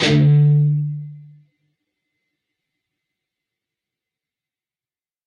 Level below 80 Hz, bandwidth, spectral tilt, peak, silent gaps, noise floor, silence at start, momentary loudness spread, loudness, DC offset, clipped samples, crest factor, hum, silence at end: -58 dBFS; 7.4 kHz; -7 dB/octave; -6 dBFS; none; under -90 dBFS; 0 s; 19 LU; -16 LUFS; under 0.1%; under 0.1%; 16 dB; none; 4.05 s